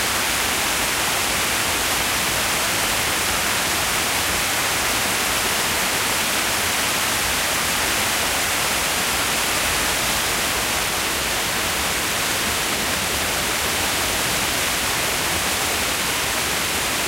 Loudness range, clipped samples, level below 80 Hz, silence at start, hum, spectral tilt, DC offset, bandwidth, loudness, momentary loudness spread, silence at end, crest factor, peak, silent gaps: 1 LU; under 0.1%; -40 dBFS; 0 s; none; -1 dB/octave; under 0.1%; 16 kHz; -19 LUFS; 1 LU; 0 s; 14 dB; -6 dBFS; none